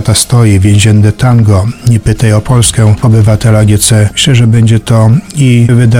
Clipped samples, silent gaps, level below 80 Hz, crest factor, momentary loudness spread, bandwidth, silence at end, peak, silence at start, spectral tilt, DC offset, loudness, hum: 2%; none; -26 dBFS; 6 dB; 3 LU; 16 kHz; 0 s; 0 dBFS; 0 s; -5.5 dB/octave; under 0.1%; -7 LUFS; none